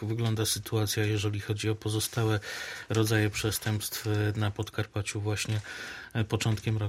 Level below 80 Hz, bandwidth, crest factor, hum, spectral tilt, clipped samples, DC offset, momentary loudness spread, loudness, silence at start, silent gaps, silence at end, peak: -56 dBFS; 16 kHz; 18 dB; none; -4.5 dB/octave; under 0.1%; under 0.1%; 7 LU; -30 LUFS; 0 s; none; 0 s; -12 dBFS